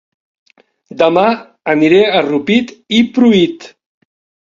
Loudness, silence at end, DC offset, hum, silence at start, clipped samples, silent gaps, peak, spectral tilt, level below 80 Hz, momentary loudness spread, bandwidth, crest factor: -12 LUFS; 0.7 s; under 0.1%; none; 0.95 s; under 0.1%; none; 0 dBFS; -6 dB/octave; -54 dBFS; 7 LU; 7.4 kHz; 14 dB